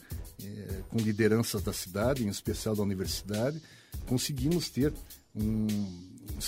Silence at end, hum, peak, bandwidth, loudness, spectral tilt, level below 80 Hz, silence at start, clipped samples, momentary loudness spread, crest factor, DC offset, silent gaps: 0 s; none; -12 dBFS; 16 kHz; -31 LUFS; -5.5 dB/octave; -46 dBFS; 0 s; under 0.1%; 16 LU; 20 dB; under 0.1%; none